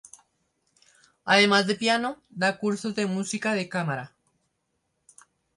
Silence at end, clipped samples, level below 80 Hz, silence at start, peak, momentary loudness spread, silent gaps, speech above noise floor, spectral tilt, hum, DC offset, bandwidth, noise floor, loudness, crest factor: 1.5 s; under 0.1%; -72 dBFS; 1.25 s; -6 dBFS; 14 LU; none; 52 dB; -4 dB/octave; none; under 0.1%; 11.5 kHz; -76 dBFS; -25 LUFS; 22 dB